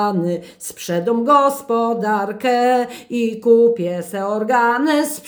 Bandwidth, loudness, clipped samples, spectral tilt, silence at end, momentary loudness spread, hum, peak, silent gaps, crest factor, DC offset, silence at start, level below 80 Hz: over 20 kHz; -17 LUFS; under 0.1%; -5 dB/octave; 0 s; 10 LU; none; -2 dBFS; none; 16 dB; under 0.1%; 0 s; -68 dBFS